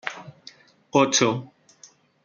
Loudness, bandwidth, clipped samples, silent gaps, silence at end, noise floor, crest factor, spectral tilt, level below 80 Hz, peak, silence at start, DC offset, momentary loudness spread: -22 LUFS; 10 kHz; under 0.1%; none; 0.8 s; -54 dBFS; 20 dB; -3 dB/octave; -66 dBFS; -6 dBFS; 0.05 s; under 0.1%; 22 LU